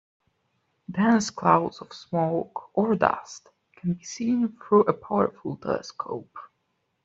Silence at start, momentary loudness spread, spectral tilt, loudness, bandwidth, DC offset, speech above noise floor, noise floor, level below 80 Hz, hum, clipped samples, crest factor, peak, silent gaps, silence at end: 0.9 s; 14 LU; -6 dB/octave; -25 LUFS; 8 kHz; under 0.1%; 50 dB; -75 dBFS; -66 dBFS; none; under 0.1%; 24 dB; -4 dBFS; none; 0.6 s